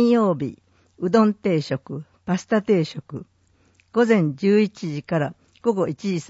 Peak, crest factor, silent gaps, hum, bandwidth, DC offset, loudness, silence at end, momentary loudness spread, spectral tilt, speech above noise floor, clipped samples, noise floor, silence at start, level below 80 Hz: -4 dBFS; 16 dB; none; none; 8 kHz; under 0.1%; -22 LUFS; 0.05 s; 13 LU; -7 dB/octave; 39 dB; under 0.1%; -60 dBFS; 0 s; -62 dBFS